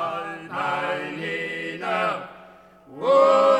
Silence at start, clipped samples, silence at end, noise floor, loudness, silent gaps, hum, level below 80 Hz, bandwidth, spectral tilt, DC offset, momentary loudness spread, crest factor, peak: 0 s; under 0.1%; 0 s; -49 dBFS; -24 LUFS; none; none; -68 dBFS; 9.6 kHz; -5 dB/octave; under 0.1%; 14 LU; 16 dB; -6 dBFS